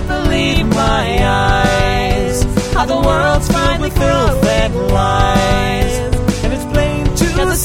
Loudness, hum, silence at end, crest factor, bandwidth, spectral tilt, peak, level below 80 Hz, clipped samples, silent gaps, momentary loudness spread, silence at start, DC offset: -14 LUFS; none; 0 s; 12 dB; 16.5 kHz; -5 dB/octave; 0 dBFS; -20 dBFS; under 0.1%; none; 4 LU; 0 s; 0.3%